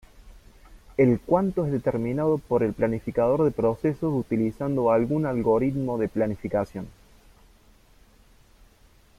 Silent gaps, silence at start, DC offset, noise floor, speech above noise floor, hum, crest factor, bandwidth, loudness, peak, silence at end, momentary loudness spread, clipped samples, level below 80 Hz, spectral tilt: none; 0.25 s; under 0.1%; -56 dBFS; 33 dB; none; 18 dB; 14 kHz; -25 LUFS; -8 dBFS; 2.3 s; 6 LU; under 0.1%; -50 dBFS; -9.5 dB/octave